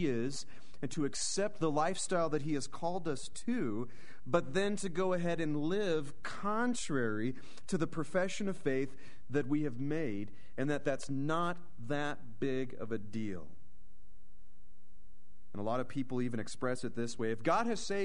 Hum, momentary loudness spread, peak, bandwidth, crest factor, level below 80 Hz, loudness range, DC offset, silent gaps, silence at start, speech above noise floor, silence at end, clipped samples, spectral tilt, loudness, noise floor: none; 9 LU; -16 dBFS; 10.5 kHz; 20 dB; -64 dBFS; 7 LU; 2%; none; 0 s; 27 dB; 0 s; under 0.1%; -5 dB/octave; -36 LUFS; -63 dBFS